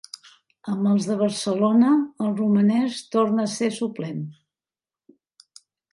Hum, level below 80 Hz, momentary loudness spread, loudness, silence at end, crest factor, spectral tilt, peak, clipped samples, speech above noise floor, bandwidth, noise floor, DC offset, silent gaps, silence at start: none; -72 dBFS; 15 LU; -22 LUFS; 1.6 s; 16 dB; -6 dB/octave; -8 dBFS; under 0.1%; over 69 dB; 11.5 kHz; under -90 dBFS; under 0.1%; none; 0.65 s